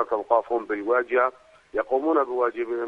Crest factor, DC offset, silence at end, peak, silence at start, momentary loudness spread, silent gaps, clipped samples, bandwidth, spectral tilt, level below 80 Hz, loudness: 18 dB; under 0.1%; 0 s; -6 dBFS; 0 s; 5 LU; none; under 0.1%; 6 kHz; -6 dB/octave; -64 dBFS; -24 LUFS